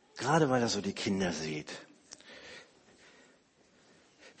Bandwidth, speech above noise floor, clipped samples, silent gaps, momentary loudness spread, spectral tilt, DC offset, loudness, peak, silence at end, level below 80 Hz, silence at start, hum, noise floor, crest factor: 8.8 kHz; 35 dB; under 0.1%; none; 24 LU; -4.5 dB/octave; under 0.1%; -31 LUFS; -14 dBFS; 0.1 s; -66 dBFS; 0.15 s; none; -66 dBFS; 22 dB